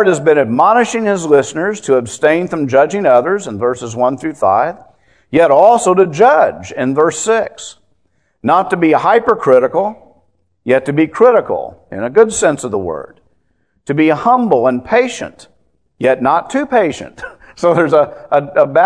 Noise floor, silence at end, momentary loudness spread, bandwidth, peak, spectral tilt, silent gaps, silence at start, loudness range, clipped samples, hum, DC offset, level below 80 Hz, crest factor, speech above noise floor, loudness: -62 dBFS; 0 s; 12 LU; 10.5 kHz; 0 dBFS; -5 dB/octave; none; 0 s; 3 LU; 0.2%; none; 0.2%; -52 dBFS; 12 dB; 50 dB; -13 LUFS